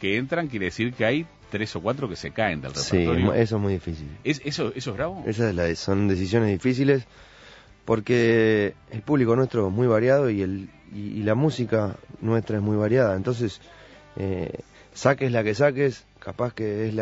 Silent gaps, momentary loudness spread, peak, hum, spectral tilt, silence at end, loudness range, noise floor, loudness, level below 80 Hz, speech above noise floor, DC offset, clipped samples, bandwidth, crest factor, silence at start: none; 11 LU; -4 dBFS; none; -6.5 dB/octave; 0 s; 3 LU; -49 dBFS; -24 LUFS; -50 dBFS; 26 dB; under 0.1%; under 0.1%; 8 kHz; 20 dB; 0 s